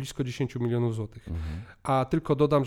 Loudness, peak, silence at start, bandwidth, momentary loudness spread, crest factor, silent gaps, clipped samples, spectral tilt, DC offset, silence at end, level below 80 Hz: -29 LUFS; -10 dBFS; 0 s; 15.5 kHz; 11 LU; 18 dB; none; under 0.1%; -7.5 dB/octave; under 0.1%; 0 s; -46 dBFS